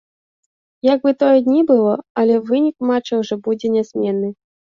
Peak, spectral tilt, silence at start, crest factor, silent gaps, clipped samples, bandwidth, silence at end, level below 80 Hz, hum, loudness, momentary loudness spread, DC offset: -2 dBFS; -7 dB/octave; 0.85 s; 14 dB; 2.10-2.15 s; under 0.1%; 7.2 kHz; 0.45 s; -64 dBFS; none; -17 LUFS; 7 LU; under 0.1%